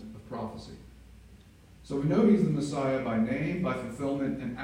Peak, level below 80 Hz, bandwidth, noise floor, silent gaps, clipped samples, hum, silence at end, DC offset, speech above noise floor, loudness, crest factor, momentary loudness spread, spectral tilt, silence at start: -12 dBFS; -54 dBFS; 10.5 kHz; -54 dBFS; none; under 0.1%; none; 0 s; under 0.1%; 26 dB; -29 LUFS; 18 dB; 17 LU; -7.5 dB/octave; 0 s